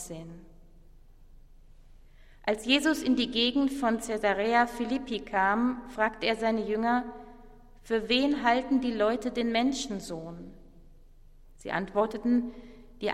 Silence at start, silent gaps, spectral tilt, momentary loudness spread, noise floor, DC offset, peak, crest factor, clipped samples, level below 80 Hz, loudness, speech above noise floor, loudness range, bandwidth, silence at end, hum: 0 s; none; -4 dB/octave; 15 LU; -53 dBFS; under 0.1%; -10 dBFS; 20 dB; under 0.1%; -52 dBFS; -28 LUFS; 25 dB; 5 LU; 14.5 kHz; 0 s; none